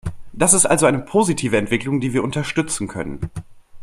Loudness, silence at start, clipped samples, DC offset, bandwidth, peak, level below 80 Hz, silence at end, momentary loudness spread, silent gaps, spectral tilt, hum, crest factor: -18 LUFS; 0.05 s; under 0.1%; under 0.1%; 15.5 kHz; 0 dBFS; -42 dBFS; 0 s; 17 LU; none; -4 dB/octave; none; 20 dB